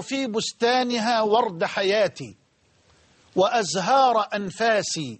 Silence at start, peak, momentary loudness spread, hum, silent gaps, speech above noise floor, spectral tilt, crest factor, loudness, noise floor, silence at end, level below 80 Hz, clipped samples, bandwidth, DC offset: 0 s; -8 dBFS; 8 LU; none; none; 40 dB; -3.5 dB/octave; 16 dB; -22 LUFS; -62 dBFS; 0.05 s; -68 dBFS; under 0.1%; 8.8 kHz; under 0.1%